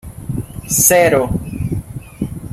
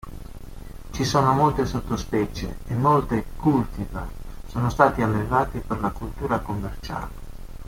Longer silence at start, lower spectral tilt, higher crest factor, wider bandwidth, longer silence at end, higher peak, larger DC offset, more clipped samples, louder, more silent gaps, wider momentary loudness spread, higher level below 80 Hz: about the same, 0.05 s vs 0.05 s; second, -4 dB/octave vs -6.5 dB/octave; about the same, 18 dB vs 22 dB; about the same, 16.5 kHz vs 16.5 kHz; about the same, 0 s vs 0 s; about the same, 0 dBFS vs -2 dBFS; neither; neither; first, -15 LUFS vs -24 LUFS; neither; second, 17 LU vs 22 LU; about the same, -34 dBFS vs -36 dBFS